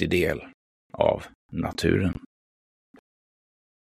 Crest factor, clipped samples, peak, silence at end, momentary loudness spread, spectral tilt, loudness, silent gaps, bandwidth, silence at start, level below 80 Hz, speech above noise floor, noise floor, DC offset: 24 dB; under 0.1%; -4 dBFS; 1.85 s; 13 LU; -6 dB/octave; -26 LUFS; 0.54-0.90 s, 1.35-1.49 s; 15 kHz; 0 s; -48 dBFS; over 65 dB; under -90 dBFS; under 0.1%